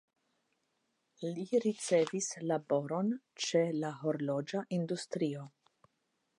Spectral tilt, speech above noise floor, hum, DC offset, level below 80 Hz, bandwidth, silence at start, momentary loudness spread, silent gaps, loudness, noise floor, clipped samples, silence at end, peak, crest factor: -5 dB/octave; 47 dB; none; under 0.1%; -88 dBFS; 11.5 kHz; 1.2 s; 8 LU; none; -35 LUFS; -81 dBFS; under 0.1%; 0.9 s; -18 dBFS; 18 dB